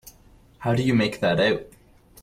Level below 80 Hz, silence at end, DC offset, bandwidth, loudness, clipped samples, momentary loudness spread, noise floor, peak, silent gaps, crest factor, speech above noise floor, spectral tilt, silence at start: -52 dBFS; 0.55 s; under 0.1%; 16 kHz; -23 LUFS; under 0.1%; 8 LU; -53 dBFS; -10 dBFS; none; 14 dB; 32 dB; -6.5 dB/octave; 0.05 s